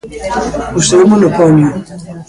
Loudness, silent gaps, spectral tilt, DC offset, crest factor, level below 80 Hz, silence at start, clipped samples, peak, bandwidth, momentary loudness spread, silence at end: -10 LUFS; none; -5.5 dB/octave; under 0.1%; 10 dB; -36 dBFS; 0.05 s; under 0.1%; 0 dBFS; 11.5 kHz; 13 LU; 0.05 s